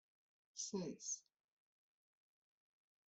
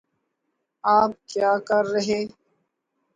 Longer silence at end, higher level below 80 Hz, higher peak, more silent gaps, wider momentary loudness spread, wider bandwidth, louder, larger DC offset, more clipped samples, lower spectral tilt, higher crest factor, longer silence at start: first, 1.85 s vs 0.85 s; second, under -90 dBFS vs -66 dBFS; second, -32 dBFS vs -6 dBFS; neither; second, 4 LU vs 8 LU; second, 8.2 kHz vs 9.4 kHz; second, -47 LUFS vs -22 LUFS; neither; neither; about the same, -3.5 dB/octave vs -4.5 dB/octave; about the same, 22 dB vs 18 dB; second, 0.55 s vs 0.85 s